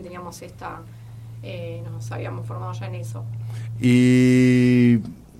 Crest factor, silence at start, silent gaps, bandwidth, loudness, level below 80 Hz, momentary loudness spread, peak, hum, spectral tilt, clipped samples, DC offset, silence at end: 14 dB; 0 s; none; 12.5 kHz; -19 LUFS; -52 dBFS; 22 LU; -8 dBFS; none; -7.5 dB/octave; under 0.1%; under 0.1%; 0.2 s